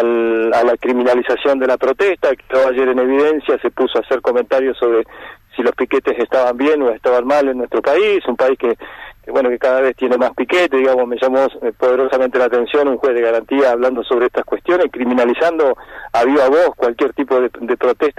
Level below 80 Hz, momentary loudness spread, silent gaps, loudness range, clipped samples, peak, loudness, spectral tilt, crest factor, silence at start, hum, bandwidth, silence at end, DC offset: -50 dBFS; 5 LU; none; 1 LU; under 0.1%; -6 dBFS; -15 LUFS; -5 dB/octave; 10 dB; 0 s; none; 13 kHz; 0.1 s; under 0.1%